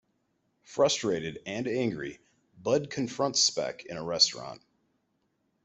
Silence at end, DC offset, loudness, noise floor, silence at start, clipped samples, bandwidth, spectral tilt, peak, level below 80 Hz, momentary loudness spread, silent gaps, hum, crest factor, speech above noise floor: 1.05 s; under 0.1%; -28 LUFS; -76 dBFS; 0.7 s; under 0.1%; 8.2 kHz; -3 dB/octave; -10 dBFS; -68 dBFS; 14 LU; none; none; 22 dB; 46 dB